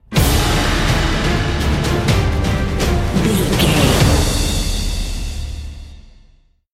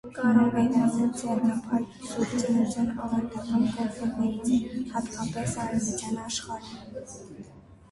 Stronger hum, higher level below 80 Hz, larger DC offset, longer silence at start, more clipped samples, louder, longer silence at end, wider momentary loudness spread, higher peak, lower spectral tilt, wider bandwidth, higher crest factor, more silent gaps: neither; first, -22 dBFS vs -54 dBFS; neither; about the same, 0.1 s vs 0.05 s; neither; first, -16 LUFS vs -27 LUFS; first, 0.75 s vs 0.15 s; second, 13 LU vs 17 LU; first, 0 dBFS vs -8 dBFS; about the same, -4.5 dB/octave vs -5.5 dB/octave; first, 16.5 kHz vs 11.5 kHz; about the same, 16 dB vs 18 dB; neither